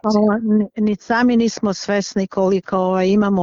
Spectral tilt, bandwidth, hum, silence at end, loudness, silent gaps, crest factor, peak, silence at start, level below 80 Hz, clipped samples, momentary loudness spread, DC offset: -6 dB/octave; 7.6 kHz; none; 0 s; -18 LUFS; none; 14 dB; -4 dBFS; 0.05 s; -52 dBFS; under 0.1%; 5 LU; under 0.1%